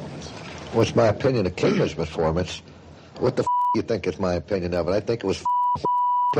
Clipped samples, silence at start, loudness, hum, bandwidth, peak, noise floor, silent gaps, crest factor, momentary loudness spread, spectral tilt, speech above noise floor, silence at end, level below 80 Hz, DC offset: under 0.1%; 0 s; -23 LUFS; none; 9.8 kHz; -6 dBFS; -44 dBFS; none; 16 dB; 13 LU; -6.5 dB/octave; 21 dB; 0 s; -48 dBFS; under 0.1%